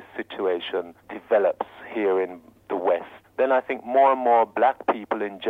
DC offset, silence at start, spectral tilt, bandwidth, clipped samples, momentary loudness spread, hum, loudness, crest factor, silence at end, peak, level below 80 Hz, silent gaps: under 0.1%; 0 s; -6.5 dB/octave; 4.6 kHz; under 0.1%; 13 LU; none; -23 LUFS; 16 dB; 0 s; -8 dBFS; -70 dBFS; none